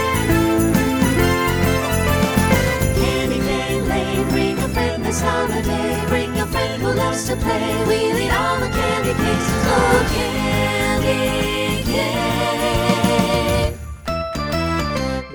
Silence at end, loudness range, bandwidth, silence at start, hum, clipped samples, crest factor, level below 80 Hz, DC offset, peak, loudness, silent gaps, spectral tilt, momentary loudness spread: 0 s; 2 LU; over 20 kHz; 0 s; none; under 0.1%; 16 dB; -30 dBFS; under 0.1%; -2 dBFS; -18 LUFS; none; -5 dB/octave; 4 LU